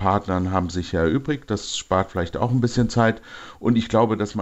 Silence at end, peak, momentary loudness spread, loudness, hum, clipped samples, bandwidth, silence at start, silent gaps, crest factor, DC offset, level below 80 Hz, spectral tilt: 0 s; -4 dBFS; 6 LU; -22 LUFS; none; under 0.1%; 8.2 kHz; 0 s; none; 16 dB; 0.1%; -44 dBFS; -6 dB/octave